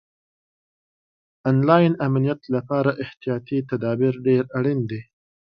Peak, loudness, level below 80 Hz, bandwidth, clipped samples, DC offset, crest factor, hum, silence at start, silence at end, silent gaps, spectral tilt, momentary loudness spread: 0 dBFS; -22 LUFS; -62 dBFS; 5.6 kHz; under 0.1%; under 0.1%; 22 dB; none; 1.45 s; 0.45 s; none; -10.5 dB/octave; 11 LU